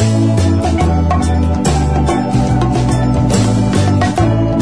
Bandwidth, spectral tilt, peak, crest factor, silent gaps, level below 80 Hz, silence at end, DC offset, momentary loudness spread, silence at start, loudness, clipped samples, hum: 11 kHz; -6.5 dB/octave; -2 dBFS; 10 dB; none; -22 dBFS; 0 s; 2%; 1 LU; 0 s; -13 LUFS; under 0.1%; none